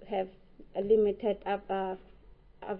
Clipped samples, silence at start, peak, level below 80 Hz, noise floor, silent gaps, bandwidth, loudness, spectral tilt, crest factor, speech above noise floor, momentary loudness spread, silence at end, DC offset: under 0.1%; 0 s; -14 dBFS; -58 dBFS; -56 dBFS; none; 4.3 kHz; -31 LUFS; -9.5 dB/octave; 18 dB; 26 dB; 15 LU; 0 s; under 0.1%